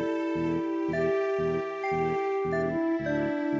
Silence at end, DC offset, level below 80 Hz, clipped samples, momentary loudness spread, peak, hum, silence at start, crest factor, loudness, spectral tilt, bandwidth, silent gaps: 0 s; under 0.1%; -54 dBFS; under 0.1%; 2 LU; -16 dBFS; none; 0 s; 12 dB; -29 LUFS; -7.5 dB/octave; 7.6 kHz; none